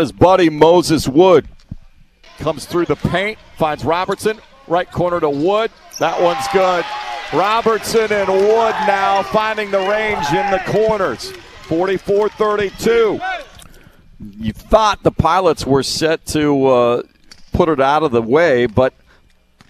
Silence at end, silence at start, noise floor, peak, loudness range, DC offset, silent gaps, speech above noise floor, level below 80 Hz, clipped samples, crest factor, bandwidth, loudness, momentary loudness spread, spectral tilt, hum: 0.8 s; 0 s; -51 dBFS; 0 dBFS; 4 LU; under 0.1%; none; 36 dB; -38 dBFS; under 0.1%; 16 dB; 14.5 kHz; -15 LUFS; 11 LU; -5 dB/octave; none